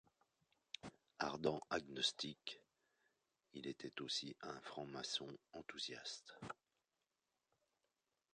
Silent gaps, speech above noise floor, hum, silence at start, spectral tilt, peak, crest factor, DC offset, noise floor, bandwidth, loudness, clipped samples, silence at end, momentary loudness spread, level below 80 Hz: none; over 42 dB; none; 0.85 s; -3 dB/octave; -24 dBFS; 26 dB; under 0.1%; under -90 dBFS; 10 kHz; -47 LUFS; under 0.1%; 1.8 s; 14 LU; -80 dBFS